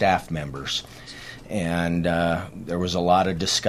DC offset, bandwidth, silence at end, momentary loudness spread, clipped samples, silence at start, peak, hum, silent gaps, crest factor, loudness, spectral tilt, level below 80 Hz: under 0.1%; 14.5 kHz; 0 s; 16 LU; under 0.1%; 0 s; -4 dBFS; none; none; 20 dB; -24 LUFS; -4.5 dB/octave; -46 dBFS